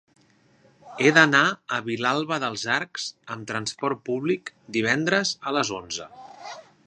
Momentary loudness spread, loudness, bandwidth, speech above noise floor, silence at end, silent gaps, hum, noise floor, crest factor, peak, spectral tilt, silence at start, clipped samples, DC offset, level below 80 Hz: 19 LU; -24 LUFS; 10 kHz; 35 dB; 0.25 s; none; none; -60 dBFS; 26 dB; 0 dBFS; -3.5 dB/octave; 0.85 s; under 0.1%; under 0.1%; -68 dBFS